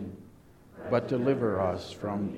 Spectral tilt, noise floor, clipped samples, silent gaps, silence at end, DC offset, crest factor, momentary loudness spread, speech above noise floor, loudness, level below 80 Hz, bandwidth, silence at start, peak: -7.5 dB/octave; -54 dBFS; under 0.1%; none; 0 s; under 0.1%; 18 dB; 16 LU; 26 dB; -30 LUFS; -60 dBFS; 13.5 kHz; 0 s; -12 dBFS